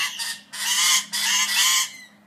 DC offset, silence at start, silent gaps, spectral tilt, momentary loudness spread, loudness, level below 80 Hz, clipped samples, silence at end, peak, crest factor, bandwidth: under 0.1%; 0 s; none; 3.5 dB/octave; 11 LU; -20 LUFS; -84 dBFS; under 0.1%; 0.2 s; -6 dBFS; 18 dB; 15.5 kHz